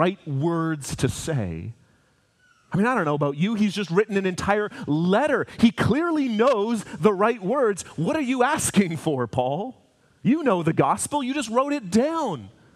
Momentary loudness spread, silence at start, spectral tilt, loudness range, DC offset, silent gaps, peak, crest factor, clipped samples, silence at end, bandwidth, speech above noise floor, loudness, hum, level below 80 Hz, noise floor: 7 LU; 0 s; -5.5 dB/octave; 4 LU; under 0.1%; none; -4 dBFS; 20 dB; under 0.1%; 0.25 s; 15 kHz; 40 dB; -23 LUFS; none; -54 dBFS; -63 dBFS